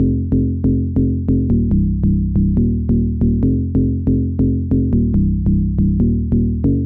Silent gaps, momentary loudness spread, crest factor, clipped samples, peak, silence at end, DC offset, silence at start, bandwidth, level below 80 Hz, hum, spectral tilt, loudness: none; 2 LU; 10 dB; under 0.1%; -6 dBFS; 0 s; 0.6%; 0 s; 1.7 kHz; -22 dBFS; none; -14.5 dB/octave; -17 LUFS